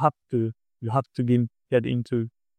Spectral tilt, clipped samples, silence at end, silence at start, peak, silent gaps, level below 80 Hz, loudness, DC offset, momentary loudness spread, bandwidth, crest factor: -9 dB/octave; under 0.1%; 0.3 s; 0 s; -6 dBFS; none; -62 dBFS; -26 LUFS; under 0.1%; 6 LU; 9.2 kHz; 20 dB